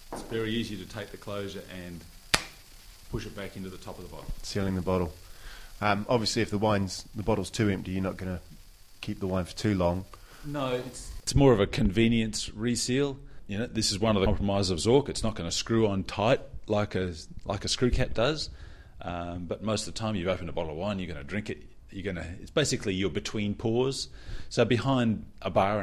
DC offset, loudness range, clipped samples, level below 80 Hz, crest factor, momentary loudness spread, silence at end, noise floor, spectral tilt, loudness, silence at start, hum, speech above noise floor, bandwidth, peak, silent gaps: under 0.1%; 7 LU; under 0.1%; -44 dBFS; 28 dB; 15 LU; 0 s; -50 dBFS; -5 dB/octave; -29 LUFS; 0 s; none; 21 dB; 15.5 kHz; 0 dBFS; none